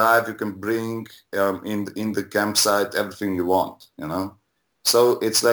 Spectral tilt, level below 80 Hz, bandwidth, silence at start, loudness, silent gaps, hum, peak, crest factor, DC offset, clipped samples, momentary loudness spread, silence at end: -3 dB/octave; -62 dBFS; over 20 kHz; 0 s; -22 LUFS; none; none; -4 dBFS; 18 dB; under 0.1%; under 0.1%; 12 LU; 0 s